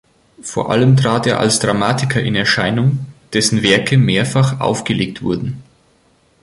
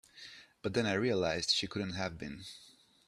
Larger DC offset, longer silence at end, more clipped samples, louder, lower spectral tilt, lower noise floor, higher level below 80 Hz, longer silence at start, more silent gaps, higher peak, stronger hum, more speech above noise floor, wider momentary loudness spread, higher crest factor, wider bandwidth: neither; first, 0.8 s vs 0.4 s; neither; first, -15 LUFS vs -34 LUFS; about the same, -5 dB/octave vs -4 dB/octave; about the same, -55 dBFS vs -54 dBFS; first, -46 dBFS vs -64 dBFS; first, 0.4 s vs 0.15 s; neither; first, 0 dBFS vs -14 dBFS; neither; first, 40 dB vs 20 dB; second, 10 LU vs 20 LU; second, 16 dB vs 22 dB; second, 11.5 kHz vs 13 kHz